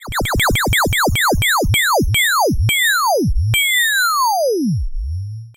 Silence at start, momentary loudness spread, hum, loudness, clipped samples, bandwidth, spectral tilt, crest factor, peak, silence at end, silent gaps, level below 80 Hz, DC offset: 0 s; 7 LU; none; -15 LUFS; under 0.1%; 17 kHz; -3.5 dB/octave; 8 dB; -8 dBFS; 0.05 s; none; -26 dBFS; under 0.1%